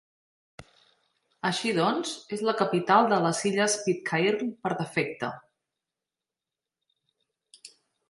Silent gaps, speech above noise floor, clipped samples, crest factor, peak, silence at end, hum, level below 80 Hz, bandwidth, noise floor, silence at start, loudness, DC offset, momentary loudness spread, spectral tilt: none; 63 dB; under 0.1%; 22 dB; -6 dBFS; 0.4 s; none; -72 dBFS; 11.5 kHz; -90 dBFS; 0.6 s; -26 LUFS; under 0.1%; 10 LU; -4 dB/octave